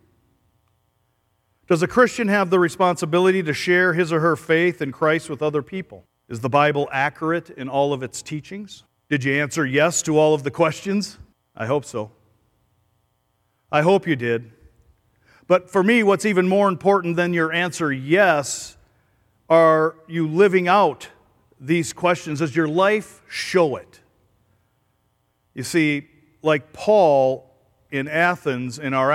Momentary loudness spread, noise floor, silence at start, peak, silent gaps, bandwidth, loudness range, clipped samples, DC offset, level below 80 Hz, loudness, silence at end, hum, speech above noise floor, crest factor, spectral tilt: 14 LU; -68 dBFS; 1.7 s; -2 dBFS; none; 15 kHz; 6 LU; under 0.1%; under 0.1%; -62 dBFS; -20 LUFS; 0 s; none; 49 dB; 18 dB; -5 dB/octave